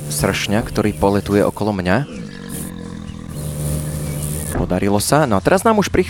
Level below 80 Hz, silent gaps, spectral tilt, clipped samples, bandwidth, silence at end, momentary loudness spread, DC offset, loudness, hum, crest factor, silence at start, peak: -36 dBFS; none; -5 dB/octave; under 0.1%; 19.5 kHz; 0 s; 14 LU; under 0.1%; -18 LUFS; none; 18 dB; 0 s; 0 dBFS